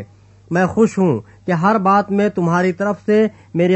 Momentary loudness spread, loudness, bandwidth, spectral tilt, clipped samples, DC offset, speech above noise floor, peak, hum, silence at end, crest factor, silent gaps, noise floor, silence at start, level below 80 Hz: 6 LU; -17 LUFS; 8.4 kHz; -7.5 dB/octave; under 0.1%; under 0.1%; 25 dB; -2 dBFS; none; 0 s; 14 dB; none; -41 dBFS; 0 s; -54 dBFS